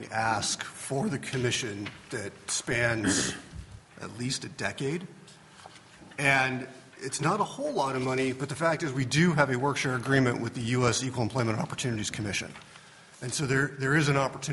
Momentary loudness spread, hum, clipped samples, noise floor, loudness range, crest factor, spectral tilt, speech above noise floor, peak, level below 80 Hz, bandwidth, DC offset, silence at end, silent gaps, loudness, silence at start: 14 LU; none; under 0.1%; -52 dBFS; 4 LU; 22 dB; -4.5 dB/octave; 23 dB; -6 dBFS; -58 dBFS; 11.5 kHz; under 0.1%; 0 s; none; -28 LUFS; 0 s